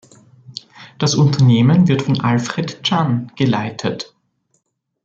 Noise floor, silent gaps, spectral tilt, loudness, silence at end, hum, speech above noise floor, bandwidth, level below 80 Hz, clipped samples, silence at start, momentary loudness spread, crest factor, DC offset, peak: -67 dBFS; none; -6 dB/octave; -16 LUFS; 1 s; none; 52 dB; 7.8 kHz; -54 dBFS; under 0.1%; 0.5 s; 21 LU; 14 dB; under 0.1%; -2 dBFS